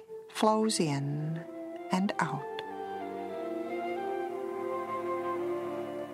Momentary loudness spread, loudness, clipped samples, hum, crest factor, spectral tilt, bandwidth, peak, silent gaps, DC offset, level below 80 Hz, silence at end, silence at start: 11 LU; -33 LUFS; under 0.1%; none; 22 dB; -5.5 dB/octave; 15.5 kHz; -12 dBFS; none; under 0.1%; -78 dBFS; 0 s; 0 s